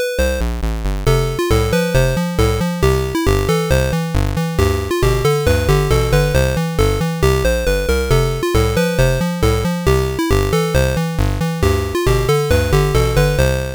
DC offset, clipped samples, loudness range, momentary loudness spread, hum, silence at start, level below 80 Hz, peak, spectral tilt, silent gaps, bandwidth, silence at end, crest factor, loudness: 0.2%; under 0.1%; 1 LU; 4 LU; none; 0 s; -22 dBFS; -4 dBFS; -5.5 dB/octave; none; over 20 kHz; 0 s; 10 dB; -16 LUFS